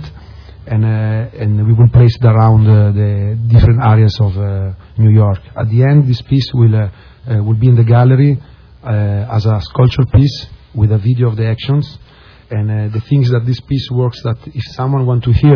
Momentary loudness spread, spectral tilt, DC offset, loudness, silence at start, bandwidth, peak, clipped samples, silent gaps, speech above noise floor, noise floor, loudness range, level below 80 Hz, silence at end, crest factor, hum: 11 LU; -9.5 dB/octave; under 0.1%; -12 LUFS; 0 s; 5.4 kHz; 0 dBFS; 0.3%; none; 23 dB; -33 dBFS; 6 LU; -30 dBFS; 0 s; 12 dB; none